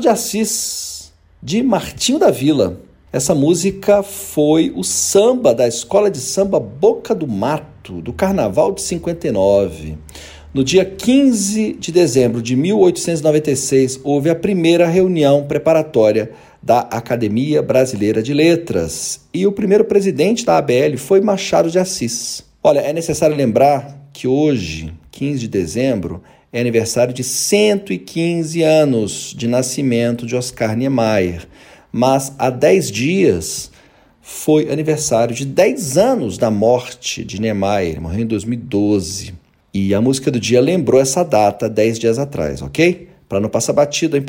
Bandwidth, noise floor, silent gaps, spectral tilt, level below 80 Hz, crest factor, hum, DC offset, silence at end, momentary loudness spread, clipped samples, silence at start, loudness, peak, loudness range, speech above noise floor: 16.5 kHz; -49 dBFS; none; -5 dB/octave; -44 dBFS; 14 dB; none; under 0.1%; 0 s; 10 LU; under 0.1%; 0 s; -16 LUFS; -2 dBFS; 3 LU; 33 dB